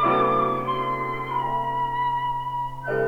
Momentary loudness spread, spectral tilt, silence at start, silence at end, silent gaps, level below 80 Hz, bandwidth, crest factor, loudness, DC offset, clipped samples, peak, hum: 7 LU; -7 dB/octave; 0 s; 0 s; none; -48 dBFS; 18.5 kHz; 14 dB; -25 LUFS; 0.5%; under 0.1%; -10 dBFS; none